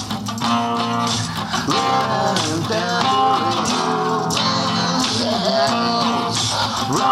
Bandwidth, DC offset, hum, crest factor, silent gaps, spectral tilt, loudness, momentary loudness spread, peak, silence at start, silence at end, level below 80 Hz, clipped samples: 16 kHz; under 0.1%; none; 14 dB; none; -3.5 dB/octave; -18 LUFS; 3 LU; -4 dBFS; 0 s; 0 s; -50 dBFS; under 0.1%